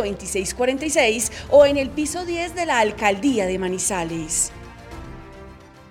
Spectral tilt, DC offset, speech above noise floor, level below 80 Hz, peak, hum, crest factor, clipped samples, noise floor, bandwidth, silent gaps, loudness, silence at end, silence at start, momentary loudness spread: -3 dB/octave; under 0.1%; 22 dB; -44 dBFS; -4 dBFS; none; 18 dB; under 0.1%; -43 dBFS; 16.5 kHz; none; -20 LUFS; 0.1 s; 0 s; 22 LU